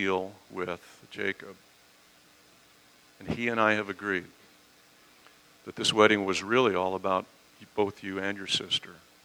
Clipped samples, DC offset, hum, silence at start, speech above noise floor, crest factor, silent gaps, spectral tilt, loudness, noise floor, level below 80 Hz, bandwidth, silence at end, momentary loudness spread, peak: under 0.1%; under 0.1%; none; 0 s; 30 dB; 28 dB; none; -3.5 dB/octave; -28 LUFS; -59 dBFS; -66 dBFS; over 20 kHz; 0.3 s; 21 LU; -4 dBFS